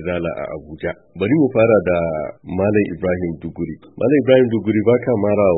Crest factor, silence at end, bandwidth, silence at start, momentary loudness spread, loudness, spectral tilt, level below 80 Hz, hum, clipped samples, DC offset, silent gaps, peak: 16 dB; 0 s; 4 kHz; 0 s; 13 LU; -18 LUFS; -12.5 dB/octave; -46 dBFS; none; under 0.1%; under 0.1%; none; 0 dBFS